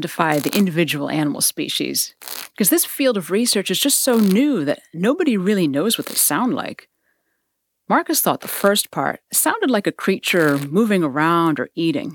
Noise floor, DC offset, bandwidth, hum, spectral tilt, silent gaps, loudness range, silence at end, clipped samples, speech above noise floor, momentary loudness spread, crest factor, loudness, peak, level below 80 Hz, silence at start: -74 dBFS; under 0.1%; 19 kHz; none; -3.5 dB/octave; none; 3 LU; 0 s; under 0.1%; 56 dB; 6 LU; 18 dB; -18 LUFS; -2 dBFS; -70 dBFS; 0 s